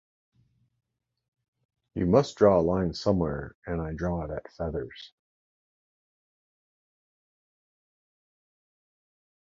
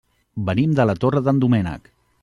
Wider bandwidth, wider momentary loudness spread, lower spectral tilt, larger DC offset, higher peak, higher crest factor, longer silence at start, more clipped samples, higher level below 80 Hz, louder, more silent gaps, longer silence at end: second, 7.8 kHz vs 10.5 kHz; first, 16 LU vs 13 LU; second, -7.5 dB/octave vs -9 dB/octave; neither; about the same, -6 dBFS vs -4 dBFS; first, 26 dB vs 16 dB; first, 1.95 s vs 0.35 s; neither; about the same, -48 dBFS vs -48 dBFS; second, -27 LUFS vs -19 LUFS; first, 3.55-3.62 s vs none; first, 4.45 s vs 0.45 s